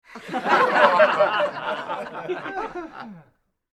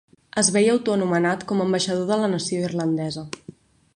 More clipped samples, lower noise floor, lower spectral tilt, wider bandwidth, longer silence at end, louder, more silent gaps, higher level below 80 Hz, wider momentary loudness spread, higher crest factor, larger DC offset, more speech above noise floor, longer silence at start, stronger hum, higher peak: neither; first, -61 dBFS vs -46 dBFS; about the same, -4.5 dB/octave vs -4.5 dB/octave; about the same, 12 kHz vs 11 kHz; about the same, 0.55 s vs 0.45 s; about the same, -21 LUFS vs -22 LUFS; neither; about the same, -64 dBFS vs -62 dBFS; first, 19 LU vs 11 LU; about the same, 22 dB vs 18 dB; neither; first, 34 dB vs 24 dB; second, 0.1 s vs 0.35 s; neither; first, 0 dBFS vs -6 dBFS